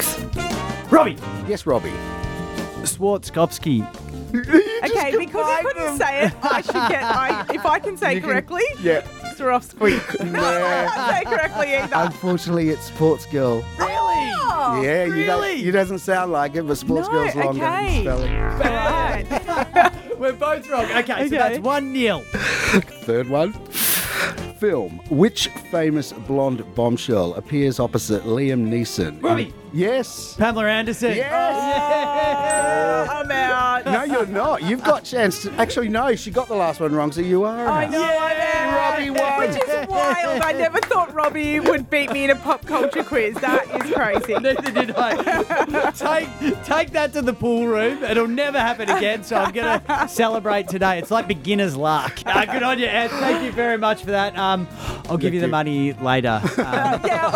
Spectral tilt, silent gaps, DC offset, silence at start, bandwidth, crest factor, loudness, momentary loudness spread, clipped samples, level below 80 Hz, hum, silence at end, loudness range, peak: -4.5 dB/octave; none; under 0.1%; 0 s; over 20 kHz; 18 dB; -20 LUFS; 5 LU; under 0.1%; -38 dBFS; none; 0 s; 2 LU; -2 dBFS